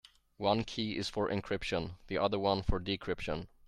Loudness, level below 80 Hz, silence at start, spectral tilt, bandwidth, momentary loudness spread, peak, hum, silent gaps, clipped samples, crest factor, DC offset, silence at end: -35 LUFS; -46 dBFS; 0.4 s; -5.5 dB/octave; 12.5 kHz; 6 LU; -14 dBFS; none; none; under 0.1%; 20 dB; under 0.1%; 0.2 s